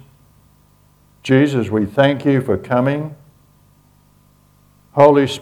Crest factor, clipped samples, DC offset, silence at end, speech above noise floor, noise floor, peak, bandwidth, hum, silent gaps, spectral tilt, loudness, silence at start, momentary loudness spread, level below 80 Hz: 18 dB; under 0.1%; under 0.1%; 0 s; 38 dB; -53 dBFS; 0 dBFS; 19 kHz; 50 Hz at -45 dBFS; none; -7 dB/octave; -16 LUFS; 1.25 s; 13 LU; -54 dBFS